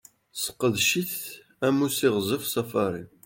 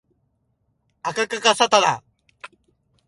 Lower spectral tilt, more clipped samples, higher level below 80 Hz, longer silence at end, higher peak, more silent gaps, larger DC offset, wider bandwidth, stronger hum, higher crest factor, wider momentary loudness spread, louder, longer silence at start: first, -3.5 dB/octave vs -1.5 dB/octave; neither; about the same, -66 dBFS vs -68 dBFS; second, 0.2 s vs 0.6 s; second, -8 dBFS vs 0 dBFS; neither; neither; first, 17 kHz vs 11.5 kHz; neither; about the same, 18 dB vs 22 dB; second, 9 LU vs 15 LU; second, -26 LUFS vs -19 LUFS; second, 0.35 s vs 1.05 s